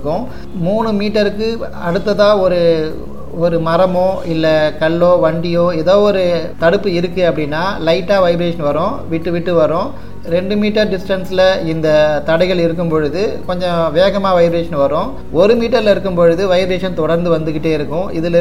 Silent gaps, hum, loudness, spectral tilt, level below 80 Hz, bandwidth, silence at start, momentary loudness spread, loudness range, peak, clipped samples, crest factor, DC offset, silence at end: none; none; -14 LUFS; -7 dB/octave; -36 dBFS; 15 kHz; 0 s; 8 LU; 2 LU; 0 dBFS; under 0.1%; 14 dB; 6%; 0 s